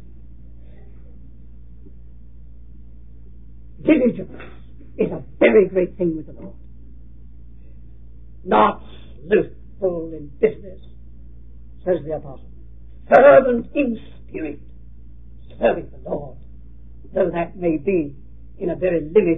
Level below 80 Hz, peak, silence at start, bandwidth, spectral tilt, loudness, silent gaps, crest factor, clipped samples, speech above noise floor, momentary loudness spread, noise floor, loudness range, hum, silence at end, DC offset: -42 dBFS; 0 dBFS; 3.8 s; 4 kHz; -9.5 dB/octave; -19 LUFS; none; 22 dB; under 0.1%; 24 dB; 24 LU; -43 dBFS; 9 LU; none; 0 s; 1%